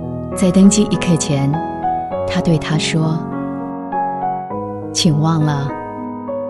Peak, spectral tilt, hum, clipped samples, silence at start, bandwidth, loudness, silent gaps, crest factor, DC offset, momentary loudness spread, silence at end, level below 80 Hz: 0 dBFS; -5.5 dB/octave; none; under 0.1%; 0 s; 12 kHz; -17 LUFS; none; 16 dB; under 0.1%; 13 LU; 0 s; -42 dBFS